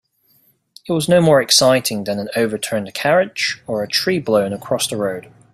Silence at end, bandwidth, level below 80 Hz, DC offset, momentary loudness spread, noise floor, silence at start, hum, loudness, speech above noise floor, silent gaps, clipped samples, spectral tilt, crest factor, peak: 0.35 s; 15.5 kHz; -56 dBFS; under 0.1%; 11 LU; -58 dBFS; 0.85 s; none; -17 LUFS; 41 dB; none; under 0.1%; -3.5 dB/octave; 18 dB; 0 dBFS